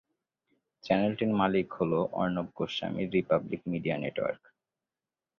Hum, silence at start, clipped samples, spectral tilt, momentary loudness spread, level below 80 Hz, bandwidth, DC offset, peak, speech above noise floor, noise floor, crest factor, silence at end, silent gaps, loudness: none; 0.85 s; under 0.1%; -7.5 dB/octave; 7 LU; -62 dBFS; 6.8 kHz; under 0.1%; -12 dBFS; over 60 dB; under -90 dBFS; 20 dB; 1.05 s; none; -30 LUFS